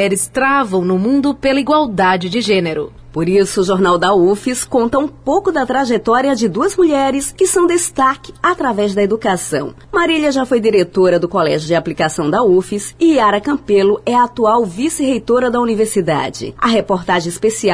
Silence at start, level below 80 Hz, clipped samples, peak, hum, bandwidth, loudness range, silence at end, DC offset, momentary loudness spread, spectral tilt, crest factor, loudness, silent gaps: 0 s; -44 dBFS; under 0.1%; -4 dBFS; none; 11 kHz; 1 LU; 0 s; 0.2%; 5 LU; -4.5 dB/octave; 10 dB; -14 LUFS; none